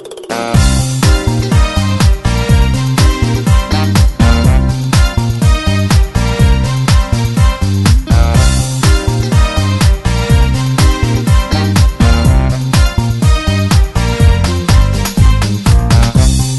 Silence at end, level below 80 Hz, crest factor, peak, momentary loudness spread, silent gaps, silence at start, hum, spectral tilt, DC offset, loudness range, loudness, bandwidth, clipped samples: 0 s; -14 dBFS; 10 dB; 0 dBFS; 3 LU; none; 0 s; none; -5.5 dB/octave; 0.2%; 1 LU; -11 LUFS; 12.5 kHz; under 0.1%